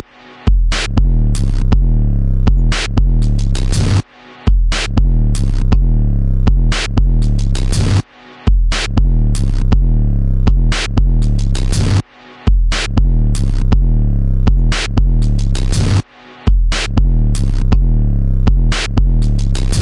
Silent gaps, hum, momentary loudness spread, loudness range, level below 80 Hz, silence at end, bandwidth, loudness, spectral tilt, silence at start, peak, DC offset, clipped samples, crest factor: none; none; 3 LU; 1 LU; -14 dBFS; 0 s; 11 kHz; -16 LUFS; -5.5 dB/octave; 0.4 s; 0 dBFS; under 0.1%; under 0.1%; 12 dB